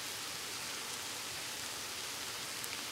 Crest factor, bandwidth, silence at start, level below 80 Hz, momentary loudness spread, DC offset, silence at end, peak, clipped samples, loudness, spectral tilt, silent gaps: 22 dB; 16 kHz; 0 s; -72 dBFS; 1 LU; under 0.1%; 0 s; -20 dBFS; under 0.1%; -39 LUFS; 0 dB/octave; none